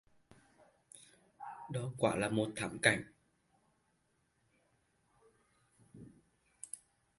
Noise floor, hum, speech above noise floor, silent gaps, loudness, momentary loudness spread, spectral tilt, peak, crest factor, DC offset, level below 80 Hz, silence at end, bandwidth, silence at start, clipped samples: -78 dBFS; none; 43 dB; none; -35 LUFS; 26 LU; -4.5 dB/octave; -10 dBFS; 32 dB; under 0.1%; -70 dBFS; 0.45 s; 11.5 kHz; 0.95 s; under 0.1%